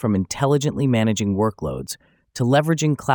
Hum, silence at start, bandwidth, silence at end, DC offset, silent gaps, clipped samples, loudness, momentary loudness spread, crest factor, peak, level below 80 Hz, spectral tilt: none; 0 s; over 20 kHz; 0 s; under 0.1%; none; under 0.1%; -21 LUFS; 13 LU; 18 dB; -4 dBFS; -50 dBFS; -6 dB/octave